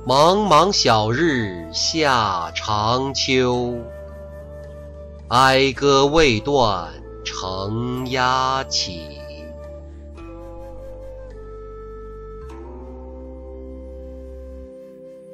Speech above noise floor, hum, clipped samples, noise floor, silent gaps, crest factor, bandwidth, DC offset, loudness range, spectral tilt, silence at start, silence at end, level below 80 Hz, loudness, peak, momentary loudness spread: 22 dB; none; under 0.1%; -40 dBFS; none; 18 dB; 15.5 kHz; under 0.1%; 19 LU; -4 dB/octave; 0 s; 0 s; -38 dBFS; -18 LUFS; -4 dBFS; 23 LU